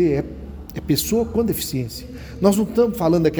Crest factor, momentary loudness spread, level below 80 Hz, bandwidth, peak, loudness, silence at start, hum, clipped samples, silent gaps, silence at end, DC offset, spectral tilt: 16 dB; 15 LU; -40 dBFS; over 20 kHz; -4 dBFS; -20 LUFS; 0 s; none; under 0.1%; none; 0 s; under 0.1%; -5.5 dB/octave